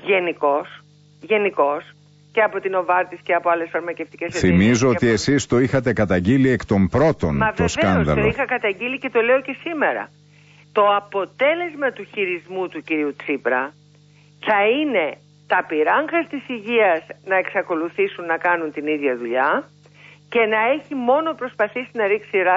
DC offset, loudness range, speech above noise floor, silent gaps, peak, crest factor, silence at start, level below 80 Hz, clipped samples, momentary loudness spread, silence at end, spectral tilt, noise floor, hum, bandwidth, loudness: under 0.1%; 4 LU; 31 dB; none; -6 dBFS; 14 dB; 0 s; -46 dBFS; under 0.1%; 8 LU; 0 s; -6 dB/octave; -51 dBFS; 50 Hz at -50 dBFS; 8 kHz; -20 LUFS